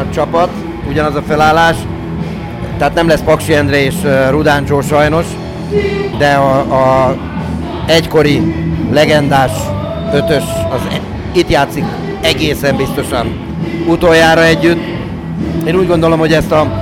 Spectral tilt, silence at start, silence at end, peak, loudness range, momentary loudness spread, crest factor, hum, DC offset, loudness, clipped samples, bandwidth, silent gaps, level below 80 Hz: -5.5 dB/octave; 0 s; 0 s; -2 dBFS; 3 LU; 11 LU; 10 dB; none; under 0.1%; -12 LUFS; under 0.1%; 16.5 kHz; none; -28 dBFS